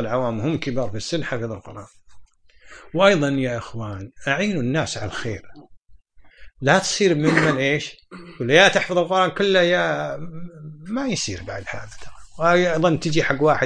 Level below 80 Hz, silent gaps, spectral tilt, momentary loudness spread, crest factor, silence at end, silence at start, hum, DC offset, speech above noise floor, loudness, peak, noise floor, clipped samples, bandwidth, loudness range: -50 dBFS; none; -4.5 dB/octave; 18 LU; 22 dB; 0 s; 0 s; none; under 0.1%; 27 dB; -20 LUFS; 0 dBFS; -48 dBFS; under 0.1%; 10.5 kHz; 6 LU